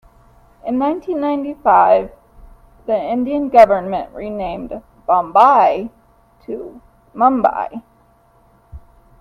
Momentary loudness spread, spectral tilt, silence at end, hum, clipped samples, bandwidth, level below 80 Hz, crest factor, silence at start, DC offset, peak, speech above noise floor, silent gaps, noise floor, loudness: 20 LU; -7 dB/octave; 0.45 s; none; under 0.1%; 6.8 kHz; -46 dBFS; 18 dB; 0.65 s; under 0.1%; 0 dBFS; 38 dB; none; -53 dBFS; -15 LUFS